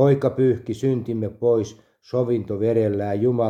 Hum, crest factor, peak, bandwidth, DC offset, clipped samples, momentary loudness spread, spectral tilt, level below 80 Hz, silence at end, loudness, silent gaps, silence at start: none; 16 dB; -4 dBFS; 9.4 kHz; under 0.1%; under 0.1%; 6 LU; -8.5 dB/octave; -60 dBFS; 0 s; -22 LUFS; none; 0 s